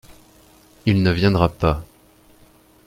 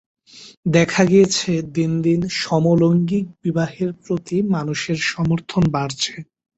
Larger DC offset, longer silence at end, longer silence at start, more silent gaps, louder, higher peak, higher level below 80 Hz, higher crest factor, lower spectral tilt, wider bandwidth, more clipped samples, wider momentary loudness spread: neither; first, 1.05 s vs 0.35 s; first, 0.85 s vs 0.35 s; second, none vs 0.57-0.63 s; about the same, -19 LUFS vs -19 LUFS; about the same, -2 dBFS vs -2 dBFS; first, -38 dBFS vs -50 dBFS; about the same, 20 dB vs 16 dB; first, -7.5 dB/octave vs -5.5 dB/octave; first, 15 kHz vs 8.2 kHz; neither; about the same, 8 LU vs 9 LU